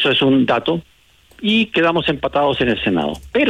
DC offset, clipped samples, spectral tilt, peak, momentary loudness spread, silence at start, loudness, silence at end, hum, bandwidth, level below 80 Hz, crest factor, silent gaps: under 0.1%; under 0.1%; -6.5 dB/octave; -6 dBFS; 7 LU; 0 s; -17 LUFS; 0 s; none; 11 kHz; -44 dBFS; 12 dB; none